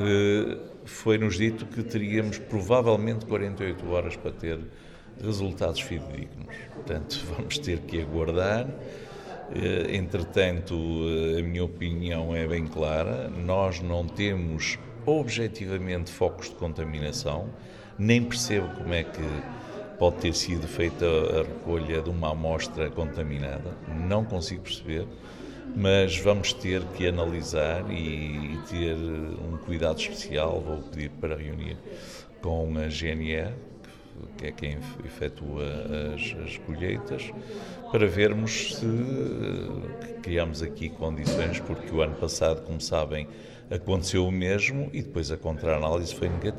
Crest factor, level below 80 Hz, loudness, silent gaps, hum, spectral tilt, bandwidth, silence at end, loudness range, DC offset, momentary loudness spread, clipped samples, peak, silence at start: 22 dB; -42 dBFS; -29 LUFS; none; none; -5.5 dB/octave; 13.5 kHz; 0 s; 6 LU; under 0.1%; 13 LU; under 0.1%; -6 dBFS; 0 s